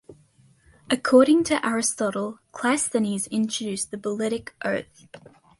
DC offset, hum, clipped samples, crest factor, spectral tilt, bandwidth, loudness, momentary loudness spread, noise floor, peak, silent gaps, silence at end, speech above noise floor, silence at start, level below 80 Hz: under 0.1%; none; under 0.1%; 20 dB; -3.5 dB/octave; 11.5 kHz; -23 LUFS; 12 LU; -58 dBFS; -6 dBFS; none; 0.4 s; 35 dB; 0.1 s; -62 dBFS